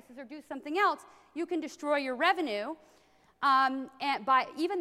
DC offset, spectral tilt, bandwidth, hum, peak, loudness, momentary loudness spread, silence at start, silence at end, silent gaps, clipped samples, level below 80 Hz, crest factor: under 0.1%; -3 dB/octave; 14.5 kHz; none; -12 dBFS; -30 LUFS; 16 LU; 0.1 s; 0 s; none; under 0.1%; -80 dBFS; 18 dB